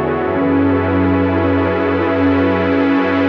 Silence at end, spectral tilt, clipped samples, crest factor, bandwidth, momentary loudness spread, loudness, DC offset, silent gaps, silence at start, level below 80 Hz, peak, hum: 0 s; -9 dB/octave; under 0.1%; 10 dB; 5.6 kHz; 2 LU; -15 LUFS; under 0.1%; none; 0 s; -44 dBFS; -4 dBFS; none